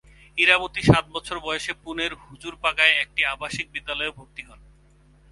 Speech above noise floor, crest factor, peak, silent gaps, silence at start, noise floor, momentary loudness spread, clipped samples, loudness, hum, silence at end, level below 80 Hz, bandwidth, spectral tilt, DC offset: 31 dB; 24 dB; 0 dBFS; none; 0.35 s; -55 dBFS; 18 LU; under 0.1%; -22 LUFS; none; 0.75 s; -46 dBFS; 11.5 kHz; -4.5 dB/octave; under 0.1%